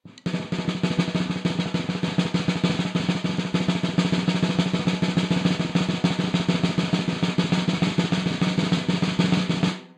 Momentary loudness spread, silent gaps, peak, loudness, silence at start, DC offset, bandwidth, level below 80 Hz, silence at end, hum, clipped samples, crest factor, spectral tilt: 3 LU; none; -8 dBFS; -24 LUFS; 0.05 s; under 0.1%; 10 kHz; -54 dBFS; 0.1 s; none; under 0.1%; 16 dB; -6 dB/octave